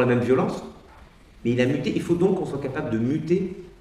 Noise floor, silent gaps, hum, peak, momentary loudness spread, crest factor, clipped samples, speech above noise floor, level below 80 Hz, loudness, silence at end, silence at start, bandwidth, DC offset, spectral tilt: -49 dBFS; none; none; -8 dBFS; 9 LU; 16 dB; under 0.1%; 26 dB; -52 dBFS; -24 LUFS; 0.1 s; 0 s; 12 kHz; under 0.1%; -7.5 dB/octave